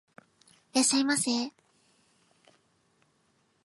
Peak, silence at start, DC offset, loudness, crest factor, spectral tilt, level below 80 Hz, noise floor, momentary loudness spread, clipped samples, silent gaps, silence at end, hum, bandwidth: -14 dBFS; 0.75 s; under 0.1%; -27 LUFS; 20 dB; -1.5 dB/octave; -84 dBFS; -71 dBFS; 8 LU; under 0.1%; none; 2.15 s; none; 12 kHz